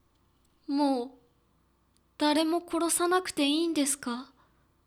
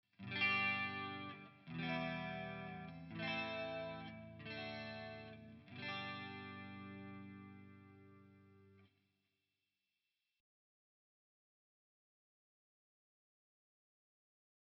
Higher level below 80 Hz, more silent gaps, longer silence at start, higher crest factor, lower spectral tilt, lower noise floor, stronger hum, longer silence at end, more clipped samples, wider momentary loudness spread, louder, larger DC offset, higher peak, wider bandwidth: first, -70 dBFS vs -78 dBFS; neither; first, 0.7 s vs 0.2 s; second, 18 dB vs 24 dB; about the same, -1.5 dB/octave vs -2.5 dB/octave; second, -68 dBFS vs under -90 dBFS; neither; second, 0.6 s vs 5.9 s; neither; second, 11 LU vs 19 LU; first, -28 LUFS vs -44 LUFS; neither; first, -14 dBFS vs -26 dBFS; first, 18.5 kHz vs 6 kHz